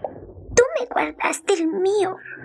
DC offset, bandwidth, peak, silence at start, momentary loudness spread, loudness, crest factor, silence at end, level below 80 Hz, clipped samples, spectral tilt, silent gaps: under 0.1%; 12.5 kHz; -2 dBFS; 0 s; 7 LU; -21 LUFS; 20 dB; 0 s; -48 dBFS; under 0.1%; -3.5 dB/octave; none